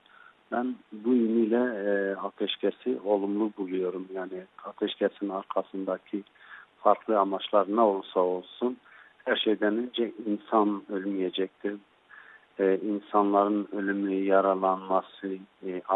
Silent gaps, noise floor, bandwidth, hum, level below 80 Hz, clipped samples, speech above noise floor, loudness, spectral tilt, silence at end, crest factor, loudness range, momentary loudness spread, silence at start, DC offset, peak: none; -57 dBFS; 4.1 kHz; none; -80 dBFS; under 0.1%; 29 dB; -28 LUFS; -9 dB/octave; 0 s; 22 dB; 4 LU; 13 LU; 0.5 s; under 0.1%; -6 dBFS